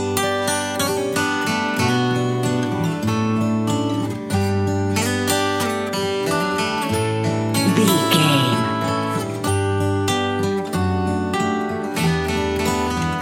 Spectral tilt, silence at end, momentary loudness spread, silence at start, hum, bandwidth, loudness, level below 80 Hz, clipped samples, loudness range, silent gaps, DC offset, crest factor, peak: -5 dB/octave; 0 s; 6 LU; 0 s; none; 17 kHz; -20 LUFS; -46 dBFS; under 0.1%; 2 LU; none; under 0.1%; 18 dB; -2 dBFS